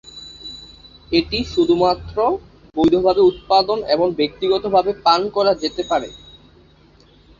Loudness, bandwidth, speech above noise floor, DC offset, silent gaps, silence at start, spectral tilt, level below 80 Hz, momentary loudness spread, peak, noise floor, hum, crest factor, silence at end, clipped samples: -18 LUFS; 7.4 kHz; 33 dB; under 0.1%; none; 0.05 s; -5.5 dB/octave; -44 dBFS; 18 LU; -2 dBFS; -50 dBFS; none; 18 dB; 1.25 s; under 0.1%